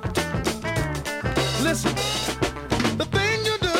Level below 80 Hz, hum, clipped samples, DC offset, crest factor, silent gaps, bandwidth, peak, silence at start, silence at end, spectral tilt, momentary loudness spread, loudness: -38 dBFS; none; under 0.1%; under 0.1%; 18 dB; none; 17 kHz; -6 dBFS; 0 s; 0 s; -4 dB/octave; 4 LU; -24 LUFS